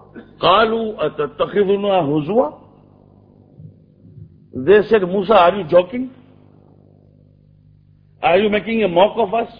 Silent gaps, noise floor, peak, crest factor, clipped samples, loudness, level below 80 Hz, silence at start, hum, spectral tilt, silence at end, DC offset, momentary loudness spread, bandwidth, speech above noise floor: none; -50 dBFS; 0 dBFS; 18 dB; under 0.1%; -16 LUFS; -50 dBFS; 0.15 s; 50 Hz at -50 dBFS; -8.5 dB/octave; 0.05 s; under 0.1%; 10 LU; 5.2 kHz; 35 dB